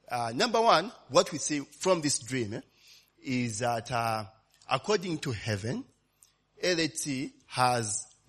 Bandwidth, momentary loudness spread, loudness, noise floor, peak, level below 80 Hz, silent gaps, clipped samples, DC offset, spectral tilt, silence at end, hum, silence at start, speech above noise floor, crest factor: 13.5 kHz; 11 LU; -30 LUFS; -66 dBFS; -8 dBFS; -66 dBFS; none; under 0.1%; under 0.1%; -3.5 dB/octave; 0.25 s; none; 0.1 s; 36 dB; 22 dB